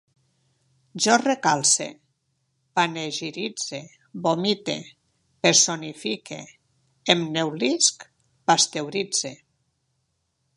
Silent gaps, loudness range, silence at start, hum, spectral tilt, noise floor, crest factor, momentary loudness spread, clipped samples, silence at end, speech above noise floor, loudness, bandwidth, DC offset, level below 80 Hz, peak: none; 4 LU; 0.95 s; none; -2 dB/octave; -74 dBFS; 26 dB; 16 LU; under 0.1%; 1.2 s; 50 dB; -22 LUFS; 11.5 kHz; under 0.1%; -72 dBFS; 0 dBFS